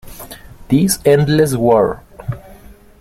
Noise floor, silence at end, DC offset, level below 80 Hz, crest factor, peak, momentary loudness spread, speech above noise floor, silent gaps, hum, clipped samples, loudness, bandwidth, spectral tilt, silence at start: -40 dBFS; 0.45 s; under 0.1%; -40 dBFS; 14 dB; -2 dBFS; 21 LU; 28 dB; none; none; under 0.1%; -14 LUFS; 16.5 kHz; -6 dB/octave; 0.05 s